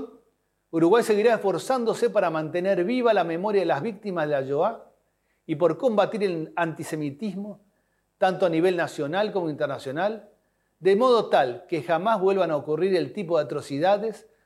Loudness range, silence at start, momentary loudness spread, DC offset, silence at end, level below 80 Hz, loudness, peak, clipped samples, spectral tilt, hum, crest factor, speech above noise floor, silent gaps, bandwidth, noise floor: 4 LU; 0 s; 10 LU; under 0.1%; 0.25 s; -74 dBFS; -24 LUFS; -8 dBFS; under 0.1%; -6 dB/octave; none; 18 dB; 47 dB; none; 13.5 kHz; -71 dBFS